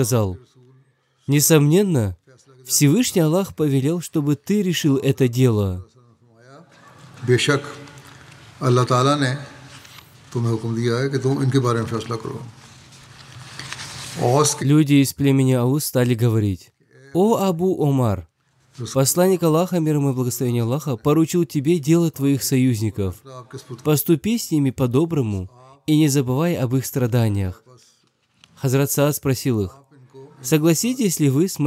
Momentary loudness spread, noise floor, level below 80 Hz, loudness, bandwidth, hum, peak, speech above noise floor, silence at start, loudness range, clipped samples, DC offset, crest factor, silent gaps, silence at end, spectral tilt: 14 LU; -62 dBFS; -58 dBFS; -19 LUFS; 16 kHz; none; 0 dBFS; 44 dB; 0 s; 5 LU; under 0.1%; under 0.1%; 20 dB; none; 0 s; -5.5 dB/octave